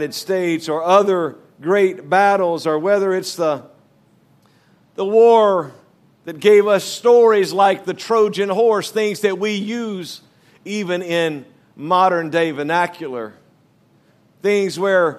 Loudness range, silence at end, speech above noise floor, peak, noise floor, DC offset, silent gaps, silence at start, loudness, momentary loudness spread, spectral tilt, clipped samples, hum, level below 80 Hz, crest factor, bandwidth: 6 LU; 0 s; 39 dB; 0 dBFS; -56 dBFS; under 0.1%; none; 0 s; -17 LUFS; 16 LU; -5 dB/octave; under 0.1%; none; -74 dBFS; 18 dB; 14 kHz